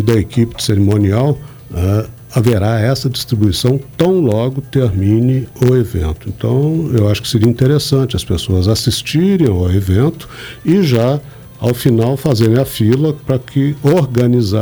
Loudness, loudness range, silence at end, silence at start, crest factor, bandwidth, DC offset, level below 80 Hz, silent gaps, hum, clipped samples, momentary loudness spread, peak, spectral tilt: -14 LUFS; 1 LU; 0 s; 0 s; 12 dB; over 20 kHz; under 0.1%; -34 dBFS; none; none; under 0.1%; 6 LU; 0 dBFS; -7 dB/octave